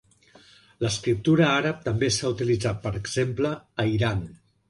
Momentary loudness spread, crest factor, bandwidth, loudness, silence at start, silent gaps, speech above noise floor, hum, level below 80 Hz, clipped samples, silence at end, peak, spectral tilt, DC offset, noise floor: 9 LU; 16 dB; 11.5 kHz; -25 LUFS; 0.8 s; none; 31 dB; none; -48 dBFS; under 0.1%; 0.35 s; -8 dBFS; -5 dB/octave; under 0.1%; -55 dBFS